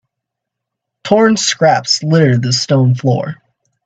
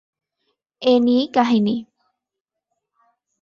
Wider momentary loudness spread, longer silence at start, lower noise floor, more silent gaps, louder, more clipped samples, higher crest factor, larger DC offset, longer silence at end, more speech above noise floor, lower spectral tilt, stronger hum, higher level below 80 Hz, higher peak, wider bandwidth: about the same, 7 LU vs 7 LU; first, 1.05 s vs 0.8 s; second, -79 dBFS vs -84 dBFS; neither; first, -12 LUFS vs -18 LUFS; neither; about the same, 14 dB vs 18 dB; neither; second, 0.5 s vs 1.6 s; about the same, 67 dB vs 67 dB; second, -5 dB/octave vs -6.5 dB/octave; neither; first, -56 dBFS vs -66 dBFS; first, 0 dBFS vs -4 dBFS; first, 9 kHz vs 7 kHz